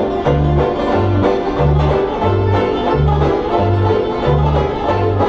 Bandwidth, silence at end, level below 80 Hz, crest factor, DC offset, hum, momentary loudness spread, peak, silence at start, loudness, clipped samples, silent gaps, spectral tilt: 8 kHz; 0 s; -24 dBFS; 12 dB; under 0.1%; none; 2 LU; -2 dBFS; 0 s; -15 LUFS; under 0.1%; none; -8.5 dB/octave